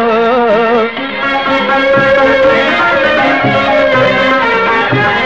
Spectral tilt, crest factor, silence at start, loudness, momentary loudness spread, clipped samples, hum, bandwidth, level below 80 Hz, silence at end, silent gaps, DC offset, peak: -6 dB/octave; 10 dB; 0 s; -9 LUFS; 4 LU; under 0.1%; none; 7.8 kHz; -40 dBFS; 0 s; none; 1%; 0 dBFS